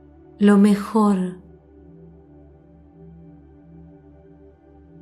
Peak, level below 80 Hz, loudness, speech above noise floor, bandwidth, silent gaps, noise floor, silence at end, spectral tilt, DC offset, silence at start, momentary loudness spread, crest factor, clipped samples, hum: -6 dBFS; -54 dBFS; -18 LUFS; 32 dB; 12 kHz; none; -49 dBFS; 3.65 s; -7.5 dB/octave; under 0.1%; 0.4 s; 14 LU; 18 dB; under 0.1%; none